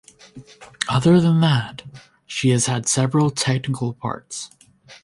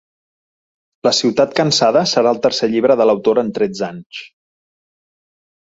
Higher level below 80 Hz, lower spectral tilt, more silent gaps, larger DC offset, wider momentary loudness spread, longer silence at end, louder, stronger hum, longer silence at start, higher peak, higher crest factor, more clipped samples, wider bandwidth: first, -54 dBFS vs -60 dBFS; about the same, -5 dB/octave vs -4 dB/octave; second, none vs 4.06-4.10 s; neither; first, 17 LU vs 12 LU; second, 0.1 s vs 1.5 s; second, -19 LUFS vs -15 LUFS; neither; second, 0.35 s vs 1.05 s; about the same, 0 dBFS vs -2 dBFS; about the same, 20 dB vs 16 dB; neither; first, 11.5 kHz vs 8 kHz